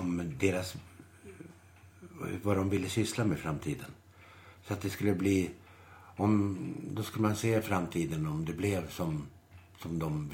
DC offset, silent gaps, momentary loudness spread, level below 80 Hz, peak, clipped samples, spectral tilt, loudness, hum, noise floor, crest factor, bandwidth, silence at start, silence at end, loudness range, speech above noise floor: under 0.1%; none; 21 LU; -58 dBFS; -14 dBFS; under 0.1%; -6 dB/octave; -33 LUFS; none; -57 dBFS; 20 dB; 17.5 kHz; 0 s; 0 s; 3 LU; 25 dB